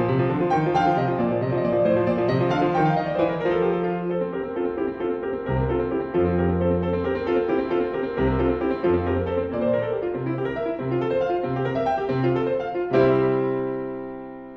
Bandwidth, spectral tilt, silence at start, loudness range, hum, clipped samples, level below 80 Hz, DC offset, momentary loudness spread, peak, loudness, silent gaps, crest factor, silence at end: 6.2 kHz; -9 dB/octave; 0 s; 3 LU; none; under 0.1%; -42 dBFS; under 0.1%; 6 LU; -6 dBFS; -23 LUFS; none; 16 dB; 0 s